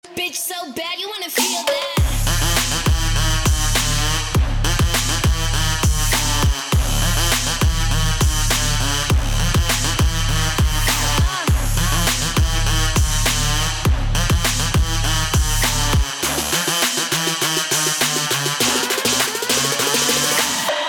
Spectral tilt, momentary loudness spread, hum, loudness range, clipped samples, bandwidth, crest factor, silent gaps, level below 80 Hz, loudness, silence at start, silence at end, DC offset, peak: -3 dB/octave; 3 LU; none; 1 LU; under 0.1%; over 20 kHz; 8 dB; none; -22 dBFS; -18 LUFS; 0.05 s; 0 s; under 0.1%; -10 dBFS